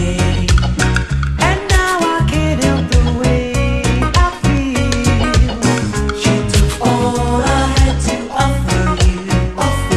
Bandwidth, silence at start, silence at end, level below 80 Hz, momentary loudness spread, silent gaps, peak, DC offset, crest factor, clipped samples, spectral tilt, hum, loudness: 13.5 kHz; 0 s; 0 s; -18 dBFS; 3 LU; none; 0 dBFS; under 0.1%; 14 dB; under 0.1%; -5 dB/octave; none; -15 LUFS